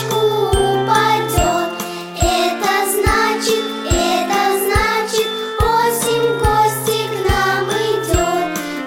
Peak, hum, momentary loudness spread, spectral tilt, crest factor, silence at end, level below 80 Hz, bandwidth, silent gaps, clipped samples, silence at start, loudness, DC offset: -2 dBFS; none; 5 LU; -4 dB/octave; 14 dB; 0 s; -28 dBFS; 17 kHz; none; under 0.1%; 0 s; -16 LUFS; 0.2%